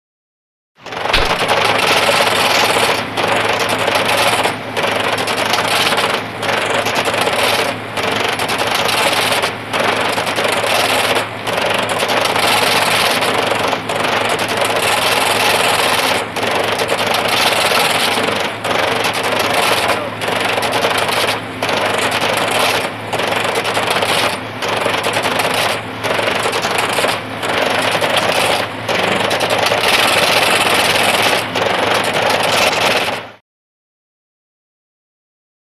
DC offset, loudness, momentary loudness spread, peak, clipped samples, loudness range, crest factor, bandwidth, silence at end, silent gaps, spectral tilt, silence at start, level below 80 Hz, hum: under 0.1%; -14 LUFS; 6 LU; 0 dBFS; under 0.1%; 3 LU; 14 dB; 15.5 kHz; 2.25 s; none; -2 dB/octave; 0.8 s; -42 dBFS; none